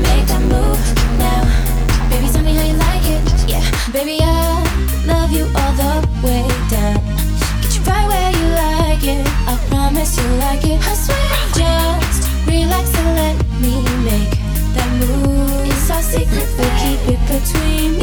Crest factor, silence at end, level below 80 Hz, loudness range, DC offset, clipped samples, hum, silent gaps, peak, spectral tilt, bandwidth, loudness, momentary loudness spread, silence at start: 12 dB; 0 s; -16 dBFS; 1 LU; under 0.1%; under 0.1%; none; none; -2 dBFS; -5 dB/octave; over 20 kHz; -16 LUFS; 2 LU; 0 s